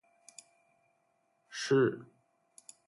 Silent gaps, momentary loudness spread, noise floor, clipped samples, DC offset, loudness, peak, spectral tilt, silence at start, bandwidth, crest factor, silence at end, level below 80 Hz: none; 26 LU; -76 dBFS; under 0.1%; under 0.1%; -30 LUFS; -16 dBFS; -5.5 dB/octave; 1.5 s; 11.5 kHz; 20 dB; 0.85 s; -80 dBFS